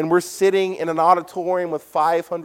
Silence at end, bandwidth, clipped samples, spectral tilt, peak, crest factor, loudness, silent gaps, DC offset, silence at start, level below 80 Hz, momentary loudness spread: 0 s; 16.5 kHz; under 0.1%; -5 dB/octave; -2 dBFS; 18 dB; -20 LUFS; none; under 0.1%; 0 s; -68 dBFS; 6 LU